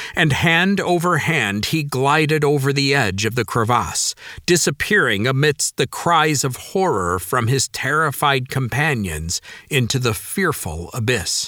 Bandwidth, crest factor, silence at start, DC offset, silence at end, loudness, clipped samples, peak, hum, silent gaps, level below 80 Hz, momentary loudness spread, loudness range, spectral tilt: 19.5 kHz; 18 dB; 0 s; under 0.1%; 0 s; -18 LUFS; under 0.1%; 0 dBFS; none; none; -44 dBFS; 6 LU; 3 LU; -4 dB/octave